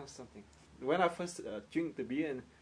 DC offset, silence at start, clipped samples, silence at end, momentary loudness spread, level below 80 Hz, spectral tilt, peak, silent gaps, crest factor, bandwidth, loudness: under 0.1%; 0 s; under 0.1%; 0.1 s; 19 LU; -68 dBFS; -5 dB/octave; -16 dBFS; none; 22 dB; 11 kHz; -37 LUFS